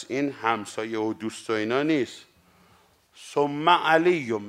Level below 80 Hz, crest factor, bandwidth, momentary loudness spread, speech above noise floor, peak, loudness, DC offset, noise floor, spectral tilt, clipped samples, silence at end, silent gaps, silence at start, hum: -74 dBFS; 22 dB; 13.5 kHz; 11 LU; 35 dB; -4 dBFS; -25 LUFS; under 0.1%; -60 dBFS; -5 dB/octave; under 0.1%; 0 s; none; 0 s; none